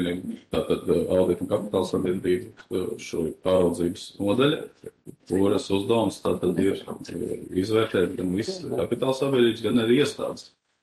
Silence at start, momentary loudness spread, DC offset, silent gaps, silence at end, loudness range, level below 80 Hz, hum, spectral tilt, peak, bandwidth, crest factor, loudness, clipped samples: 0 s; 10 LU; under 0.1%; none; 0.35 s; 2 LU; -56 dBFS; none; -6 dB/octave; -8 dBFS; 12.5 kHz; 16 dB; -25 LUFS; under 0.1%